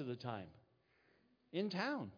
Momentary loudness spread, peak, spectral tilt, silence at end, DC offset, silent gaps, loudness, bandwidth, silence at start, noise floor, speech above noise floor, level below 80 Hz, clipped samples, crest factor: 10 LU; -26 dBFS; -4.5 dB/octave; 0 s; under 0.1%; none; -43 LUFS; 5.4 kHz; 0 s; -75 dBFS; 32 dB; -84 dBFS; under 0.1%; 20 dB